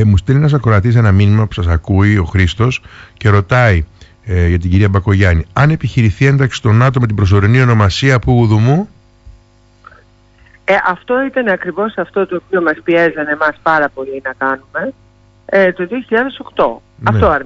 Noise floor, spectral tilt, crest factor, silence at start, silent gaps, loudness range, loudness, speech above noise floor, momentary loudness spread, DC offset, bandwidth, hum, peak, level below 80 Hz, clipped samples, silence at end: -47 dBFS; -7.5 dB/octave; 12 dB; 0 s; none; 5 LU; -13 LUFS; 35 dB; 8 LU; under 0.1%; 8 kHz; 50 Hz at -35 dBFS; 0 dBFS; -30 dBFS; under 0.1%; 0 s